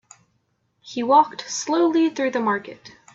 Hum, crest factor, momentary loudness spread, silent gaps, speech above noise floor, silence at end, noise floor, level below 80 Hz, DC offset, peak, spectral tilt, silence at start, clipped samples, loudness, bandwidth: none; 20 dB; 11 LU; none; 49 dB; 0.25 s; -69 dBFS; -70 dBFS; under 0.1%; -2 dBFS; -3.5 dB/octave; 0.85 s; under 0.1%; -21 LUFS; 8 kHz